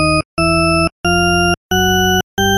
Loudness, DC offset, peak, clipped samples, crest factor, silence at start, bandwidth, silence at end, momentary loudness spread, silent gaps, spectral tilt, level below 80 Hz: -14 LUFS; under 0.1%; -4 dBFS; under 0.1%; 10 dB; 0 s; 13 kHz; 0 s; 3 LU; 0.25-0.37 s, 0.92-1.04 s, 1.57-1.70 s, 2.23-2.37 s; -4 dB/octave; -30 dBFS